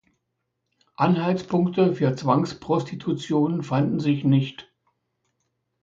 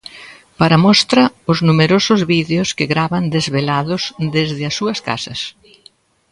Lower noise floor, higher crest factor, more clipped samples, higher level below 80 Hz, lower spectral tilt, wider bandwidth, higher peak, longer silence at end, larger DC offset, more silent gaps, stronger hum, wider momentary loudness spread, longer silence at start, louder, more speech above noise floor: first, -78 dBFS vs -50 dBFS; about the same, 18 dB vs 16 dB; neither; second, -62 dBFS vs -50 dBFS; first, -8 dB/octave vs -5 dB/octave; second, 7.8 kHz vs 11 kHz; second, -6 dBFS vs 0 dBFS; first, 1.2 s vs 0.8 s; neither; neither; neither; second, 5 LU vs 11 LU; first, 1 s vs 0.15 s; second, -23 LUFS vs -15 LUFS; first, 56 dB vs 35 dB